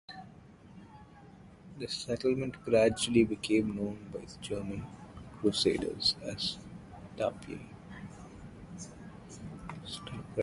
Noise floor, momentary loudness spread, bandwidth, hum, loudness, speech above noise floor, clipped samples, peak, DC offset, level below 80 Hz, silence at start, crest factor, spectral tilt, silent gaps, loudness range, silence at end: -54 dBFS; 22 LU; 11.5 kHz; none; -32 LUFS; 22 dB; under 0.1%; -12 dBFS; under 0.1%; -58 dBFS; 0.1 s; 22 dB; -4.5 dB/octave; none; 11 LU; 0 s